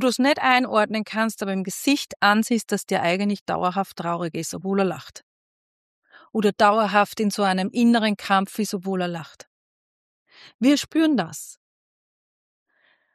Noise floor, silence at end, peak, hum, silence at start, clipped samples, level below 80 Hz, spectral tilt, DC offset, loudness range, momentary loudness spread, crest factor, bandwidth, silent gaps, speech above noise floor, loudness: under -90 dBFS; 1.6 s; -4 dBFS; none; 0 s; under 0.1%; -68 dBFS; -4.5 dB/octave; under 0.1%; 5 LU; 10 LU; 20 dB; 13.5 kHz; 2.16-2.20 s, 3.41-3.46 s, 5.23-6.02 s, 9.47-10.26 s, 10.54-10.59 s; over 68 dB; -22 LUFS